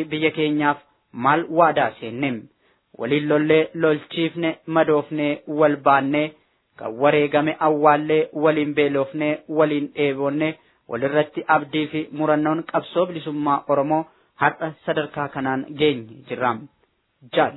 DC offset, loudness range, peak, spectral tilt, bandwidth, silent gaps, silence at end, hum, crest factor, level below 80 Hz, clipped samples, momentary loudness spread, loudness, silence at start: under 0.1%; 4 LU; -2 dBFS; -10 dB/octave; 4.1 kHz; none; 0 s; none; 20 dB; -66 dBFS; under 0.1%; 9 LU; -21 LUFS; 0 s